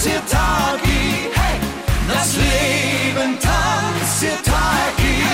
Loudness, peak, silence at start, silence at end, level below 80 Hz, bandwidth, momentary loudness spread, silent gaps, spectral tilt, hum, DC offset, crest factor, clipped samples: -17 LUFS; -6 dBFS; 0 s; 0 s; -24 dBFS; 16.5 kHz; 3 LU; none; -3.5 dB/octave; none; under 0.1%; 12 dB; under 0.1%